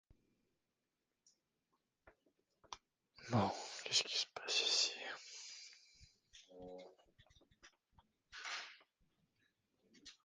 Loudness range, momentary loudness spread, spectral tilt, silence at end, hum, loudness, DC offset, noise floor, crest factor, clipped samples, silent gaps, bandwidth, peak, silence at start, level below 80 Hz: 16 LU; 23 LU; -2.5 dB/octave; 0.1 s; none; -39 LUFS; under 0.1%; -90 dBFS; 26 dB; under 0.1%; none; 10 kHz; -20 dBFS; 2.05 s; -76 dBFS